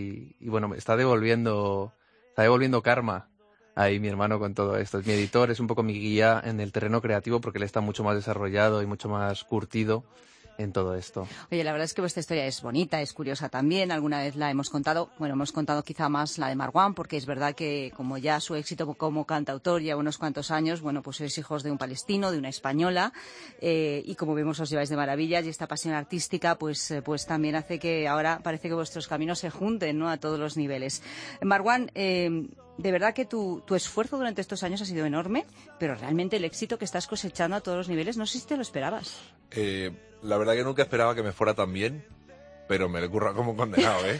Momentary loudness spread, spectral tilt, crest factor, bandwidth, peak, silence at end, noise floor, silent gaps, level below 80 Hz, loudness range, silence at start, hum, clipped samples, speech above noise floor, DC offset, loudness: 9 LU; -5 dB/octave; 22 dB; 10.5 kHz; -6 dBFS; 0 s; -51 dBFS; none; -62 dBFS; 4 LU; 0 s; none; under 0.1%; 23 dB; under 0.1%; -28 LUFS